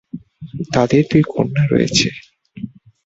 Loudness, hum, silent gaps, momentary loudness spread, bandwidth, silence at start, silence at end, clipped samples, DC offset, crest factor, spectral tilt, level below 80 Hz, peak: -16 LUFS; none; none; 20 LU; 8 kHz; 0.15 s; 0.35 s; under 0.1%; under 0.1%; 18 dB; -5.5 dB/octave; -46 dBFS; 0 dBFS